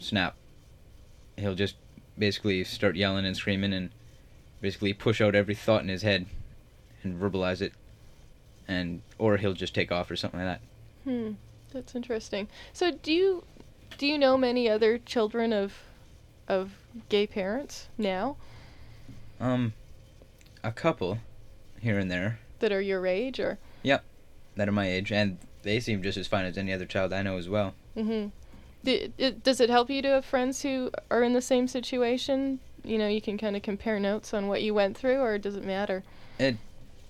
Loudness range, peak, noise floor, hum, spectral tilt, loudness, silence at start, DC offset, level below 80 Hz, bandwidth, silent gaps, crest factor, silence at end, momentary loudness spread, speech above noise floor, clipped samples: 6 LU; -10 dBFS; -53 dBFS; none; -5.5 dB/octave; -29 LUFS; 0 s; under 0.1%; -52 dBFS; 14.5 kHz; none; 20 dB; 0.05 s; 11 LU; 25 dB; under 0.1%